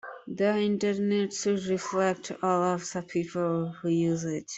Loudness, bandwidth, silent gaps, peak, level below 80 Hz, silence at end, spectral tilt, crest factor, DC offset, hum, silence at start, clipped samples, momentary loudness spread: -28 LUFS; 8.2 kHz; none; -12 dBFS; -68 dBFS; 0 s; -5.5 dB/octave; 16 dB; under 0.1%; none; 0.05 s; under 0.1%; 6 LU